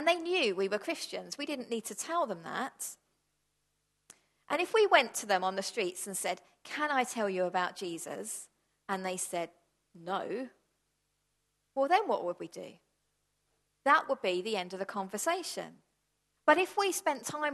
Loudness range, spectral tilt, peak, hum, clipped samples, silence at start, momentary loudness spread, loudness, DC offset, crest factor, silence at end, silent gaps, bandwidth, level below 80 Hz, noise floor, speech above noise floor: 8 LU; -2.5 dB/octave; -10 dBFS; 50 Hz at -85 dBFS; under 0.1%; 0 s; 14 LU; -32 LUFS; under 0.1%; 24 dB; 0 s; none; 12.5 kHz; -84 dBFS; -80 dBFS; 47 dB